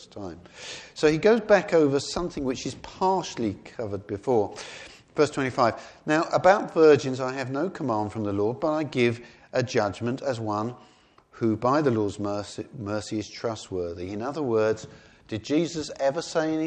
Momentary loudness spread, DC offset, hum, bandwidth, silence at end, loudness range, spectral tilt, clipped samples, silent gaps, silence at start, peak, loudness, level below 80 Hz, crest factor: 15 LU; under 0.1%; none; 9.6 kHz; 0 s; 6 LU; -5.5 dB/octave; under 0.1%; none; 0 s; -4 dBFS; -26 LUFS; -58 dBFS; 22 dB